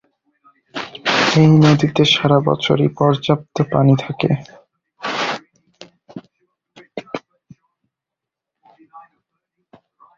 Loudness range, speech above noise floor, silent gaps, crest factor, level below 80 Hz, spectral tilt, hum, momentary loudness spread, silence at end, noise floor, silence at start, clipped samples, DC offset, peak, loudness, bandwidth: 24 LU; 70 dB; none; 18 dB; -52 dBFS; -6 dB/octave; none; 21 LU; 1.2 s; -84 dBFS; 0.75 s; under 0.1%; under 0.1%; 0 dBFS; -15 LUFS; 7.6 kHz